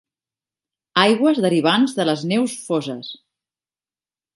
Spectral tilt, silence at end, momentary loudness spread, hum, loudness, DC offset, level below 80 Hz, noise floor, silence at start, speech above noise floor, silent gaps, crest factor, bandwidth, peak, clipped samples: -5 dB/octave; 1.2 s; 12 LU; none; -18 LUFS; under 0.1%; -72 dBFS; under -90 dBFS; 0.95 s; over 72 dB; none; 20 dB; 11.5 kHz; 0 dBFS; under 0.1%